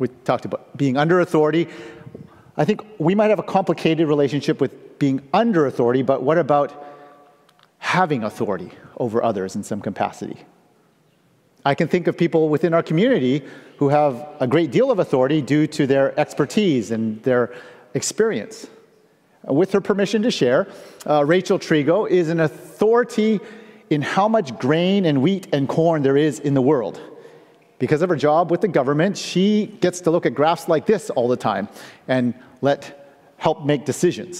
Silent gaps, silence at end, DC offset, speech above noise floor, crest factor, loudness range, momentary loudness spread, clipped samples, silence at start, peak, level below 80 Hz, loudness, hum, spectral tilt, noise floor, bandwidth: none; 0 s; under 0.1%; 40 dB; 16 dB; 4 LU; 10 LU; under 0.1%; 0 s; -2 dBFS; -64 dBFS; -20 LUFS; none; -6 dB/octave; -59 dBFS; 15 kHz